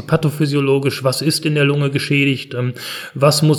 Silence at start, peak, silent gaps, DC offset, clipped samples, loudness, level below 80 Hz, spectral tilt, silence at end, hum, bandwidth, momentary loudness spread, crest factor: 0 s; -2 dBFS; none; under 0.1%; under 0.1%; -17 LUFS; -56 dBFS; -5.5 dB/octave; 0 s; none; 18 kHz; 8 LU; 14 dB